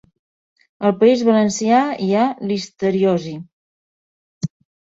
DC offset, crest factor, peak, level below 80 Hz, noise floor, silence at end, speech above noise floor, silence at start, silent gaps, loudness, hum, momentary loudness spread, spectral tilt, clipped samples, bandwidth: under 0.1%; 18 dB; -2 dBFS; -60 dBFS; under -90 dBFS; 0.5 s; over 73 dB; 0.8 s; 3.53-4.41 s; -17 LUFS; none; 15 LU; -6 dB/octave; under 0.1%; 8 kHz